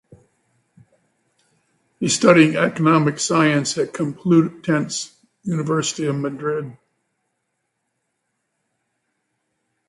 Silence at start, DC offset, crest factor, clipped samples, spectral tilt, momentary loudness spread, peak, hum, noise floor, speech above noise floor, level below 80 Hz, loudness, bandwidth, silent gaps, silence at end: 2 s; under 0.1%; 22 dB; under 0.1%; -5 dB/octave; 13 LU; 0 dBFS; none; -75 dBFS; 57 dB; -64 dBFS; -19 LUFS; 11.5 kHz; none; 3.15 s